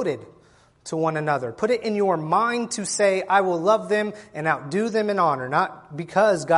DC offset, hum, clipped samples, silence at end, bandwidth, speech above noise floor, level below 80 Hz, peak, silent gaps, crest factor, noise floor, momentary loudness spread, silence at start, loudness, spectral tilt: under 0.1%; none; under 0.1%; 0 s; 11.5 kHz; 33 dB; -66 dBFS; -6 dBFS; none; 18 dB; -55 dBFS; 8 LU; 0 s; -23 LUFS; -4.5 dB/octave